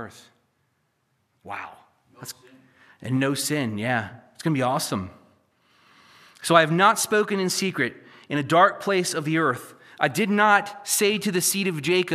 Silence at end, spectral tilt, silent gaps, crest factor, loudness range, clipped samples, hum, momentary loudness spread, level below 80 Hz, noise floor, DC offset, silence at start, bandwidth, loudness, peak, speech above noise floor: 0 s; -4 dB/octave; none; 24 dB; 8 LU; under 0.1%; none; 19 LU; -72 dBFS; -71 dBFS; under 0.1%; 0 s; 15 kHz; -22 LUFS; -2 dBFS; 48 dB